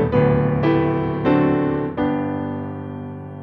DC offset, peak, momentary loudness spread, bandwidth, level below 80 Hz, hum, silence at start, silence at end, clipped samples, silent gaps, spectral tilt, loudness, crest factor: under 0.1%; -4 dBFS; 13 LU; 5.2 kHz; -42 dBFS; none; 0 s; 0 s; under 0.1%; none; -10.5 dB/octave; -20 LUFS; 16 dB